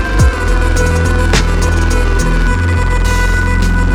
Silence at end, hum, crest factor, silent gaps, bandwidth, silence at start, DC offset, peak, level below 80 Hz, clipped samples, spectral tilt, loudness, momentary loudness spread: 0 s; none; 10 dB; none; 13.5 kHz; 0 s; under 0.1%; 0 dBFS; -12 dBFS; under 0.1%; -5.5 dB/octave; -13 LUFS; 2 LU